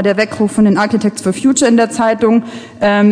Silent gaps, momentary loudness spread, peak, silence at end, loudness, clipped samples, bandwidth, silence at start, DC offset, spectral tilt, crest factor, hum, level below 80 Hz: none; 5 LU; 0 dBFS; 0 s; -13 LUFS; under 0.1%; 10.5 kHz; 0 s; under 0.1%; -5 dB/octave; 12 dB; none; -50 dBFS